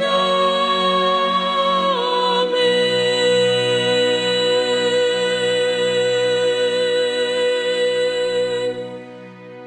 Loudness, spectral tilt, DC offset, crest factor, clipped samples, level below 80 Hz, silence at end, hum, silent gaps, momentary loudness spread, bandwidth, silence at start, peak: -17 LUFS; -3.5 dB/octave; under 0.1%; 12 dB; under 0.1%; -64 dBFS; 0 s; none; none; 4 LU; 11 kHz; 0 s; -6 dBFS